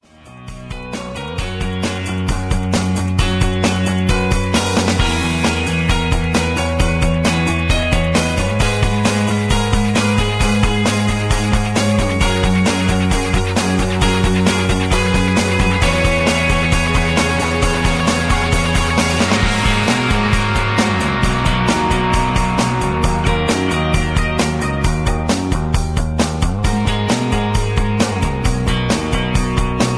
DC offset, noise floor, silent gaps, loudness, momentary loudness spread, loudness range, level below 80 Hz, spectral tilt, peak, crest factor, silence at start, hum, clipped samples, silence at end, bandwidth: under 0.1%; -37 dBFS; none; -16 LUFS; 4 LU; 3 LU; -22 dBFS; -5 dB/octave; -2 dBFS; 14 dB; 0.25 s; none; under 0.1%; 0 s; 11 kHz